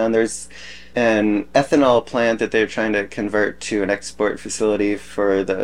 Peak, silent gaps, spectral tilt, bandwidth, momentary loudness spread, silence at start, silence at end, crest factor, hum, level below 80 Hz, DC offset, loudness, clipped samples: -2 dBFS; none; -4.5 dB/octave; 12 kHz; 7 LU; 0 s; 0 s; 18 dB; none; -50 dBFS; 0.9%; -19 LUFS; under 0.1%